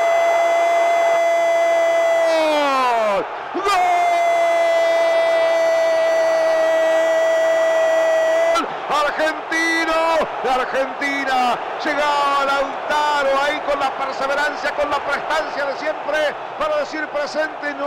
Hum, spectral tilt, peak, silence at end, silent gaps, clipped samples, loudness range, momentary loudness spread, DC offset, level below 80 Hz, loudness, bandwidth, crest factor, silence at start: none; -2 dB/octave; -8 dBFS; 0 s; none; under 0.1%; 4 LU; 6 LU; under 0.1%; -54 dBFS; -18 LUFS; 15 kHz; 10 dB; 0 s